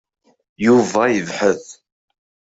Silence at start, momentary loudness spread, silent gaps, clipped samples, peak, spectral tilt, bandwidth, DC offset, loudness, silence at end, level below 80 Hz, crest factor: 0.6 s; 6 LU; none; under 0.1%; -2 dBFS; -5 dB/octave; 8 kHz; under 0.1%; -17 LUFS; 0.9 s; -60 dBFS; 16 dB